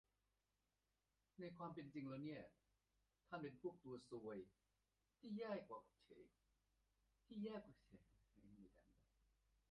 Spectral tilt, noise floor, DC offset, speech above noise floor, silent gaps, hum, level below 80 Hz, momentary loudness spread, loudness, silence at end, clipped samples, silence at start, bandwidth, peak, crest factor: -6 dB/octave; under -90 dBFS; under 0.1%; over 35 dB; none; none; -84 dBFS; 16 LU; -55 LUFS; 0.8 s; under 0.1%; 1.4 s; 5.6 kHz; -36 dBFS; 22 dB